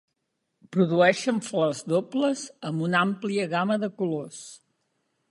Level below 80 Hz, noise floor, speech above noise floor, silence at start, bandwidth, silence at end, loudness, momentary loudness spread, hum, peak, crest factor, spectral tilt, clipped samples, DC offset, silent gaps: -72 dBFS; -79 dBFS; 53 dB; 0.7 s; 11.5 kHz; 0.75 s; -25 LUFS; 12 LU; none; -8 dBFS; 20 dB; -5.5 dB/octave; under 0.1%; under 0.1%; none